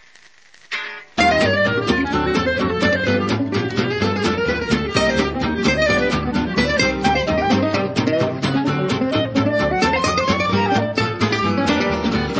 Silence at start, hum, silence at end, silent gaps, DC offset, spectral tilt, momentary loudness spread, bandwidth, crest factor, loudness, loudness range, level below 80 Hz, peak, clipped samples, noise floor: 0.7 s; none; 0 s; none; under 0.1%; -5.5 dB/octave; 4 LU; 8 kHz; 16 dB; -18 LUFS; 1 LU; -36 dBFS; -2 dBFS; under 0.1%; -50 dBFS